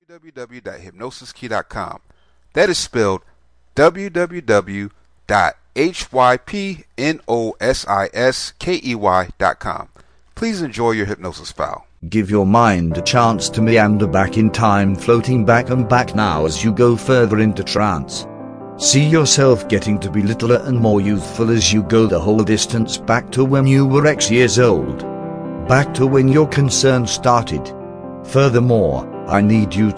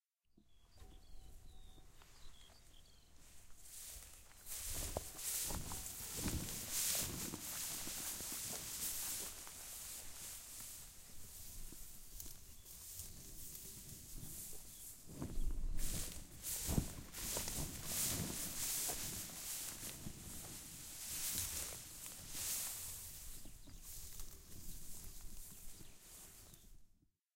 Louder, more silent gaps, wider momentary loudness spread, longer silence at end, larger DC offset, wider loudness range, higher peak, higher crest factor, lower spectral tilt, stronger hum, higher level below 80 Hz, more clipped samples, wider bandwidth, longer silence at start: first, -16 LUFS vs -44 LUFS; neither; second, 14 LU vs 22 LU; second, 0 s vs 0.5 s; neither; second, 5 LU vs 13 LU; first, 0 dBFS vs -20 dBFS; second, 16 dB vs 26 dB; first, -5 dB/octave vs -2 dB/octave; neither; first, -40 dBFS vs -52 dBFS; neither; second, 10.5 kHz vs 16 kHz; second, 0.1 s vs 0.35 s